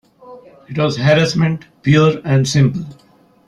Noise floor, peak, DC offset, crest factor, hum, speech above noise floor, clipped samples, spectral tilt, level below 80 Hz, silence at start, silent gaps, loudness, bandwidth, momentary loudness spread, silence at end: -40 dBFS; -2 dBFS; under 0.1%; 14 dB; none; 26 dB; under 0.1%; -6 dB/octave; -48 dBFS; 0.25 s; none; -15 LUFS; 10.5 kHz; 12 LU; 0.55 s